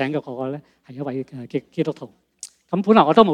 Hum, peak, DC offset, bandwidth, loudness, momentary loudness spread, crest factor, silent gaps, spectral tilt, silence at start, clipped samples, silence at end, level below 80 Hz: none; 0 dBFS; under 0.1%; 11.5 kHz; -21 LUFS; 24 LU; 20 dB; none; -6.5 dB/octave; 0 s; under 0.1%; 0 s; -60 dBFS